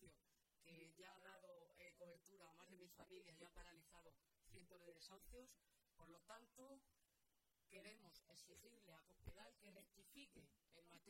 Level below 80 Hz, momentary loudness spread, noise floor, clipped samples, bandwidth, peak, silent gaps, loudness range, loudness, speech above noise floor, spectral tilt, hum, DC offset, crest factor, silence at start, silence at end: -76 dBFS; 4 LU; -88 dBFS; under 0.1%; 16.5 kHz; -44 dBFS; none; 1 LU; -66 LUFS; 22 dB; -3.5 dB/octave; none; under 0.1%; 24 dB; 0 s; 0 s